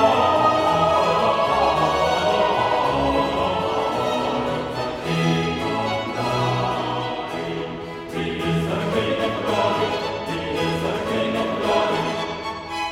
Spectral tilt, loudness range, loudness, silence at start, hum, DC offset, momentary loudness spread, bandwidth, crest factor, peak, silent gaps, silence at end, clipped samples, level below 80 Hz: -5.5 dB/octave; 5 LU; -22 LUFS; 0 s; none; under 0.1%; 9 LU; 16 kHz; 16 dB; -4 dBFS; none; 0 s; under 0.1%; -46 dBFS